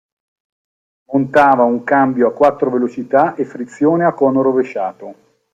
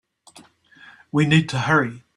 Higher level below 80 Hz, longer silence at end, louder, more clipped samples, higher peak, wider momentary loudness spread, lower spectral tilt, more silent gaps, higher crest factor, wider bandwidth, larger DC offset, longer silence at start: about the same, -58 dBFS vs -56 dBFS; first, 0.4 s vs 0.15 s; first, -15 LUFS vs -19 LUFS; neither; about the same, 0 dBFS vs -2 dBFS; first, 11 LU vs 5 LU; first, -8 dB/octave vs -6 dB/octave; neither; second, 14 dB vs 20 dB; second, 7.8 kHz vs 11 kHz; neither; about the same, 1.1 s vs 1.15 s